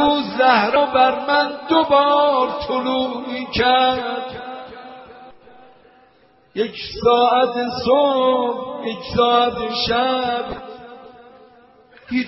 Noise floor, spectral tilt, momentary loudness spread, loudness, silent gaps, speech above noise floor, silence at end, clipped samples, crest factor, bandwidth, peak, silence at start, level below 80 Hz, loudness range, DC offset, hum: -54 dBFS; -1.5 dB/octave; 16 LU; -18 LUFS; none; 37 dB; 0 s; under 0.1%; 18 dB; 6 kHz; -2 dBFS; 0 s; -48 dBFS; 6 LU; under 0.1%; none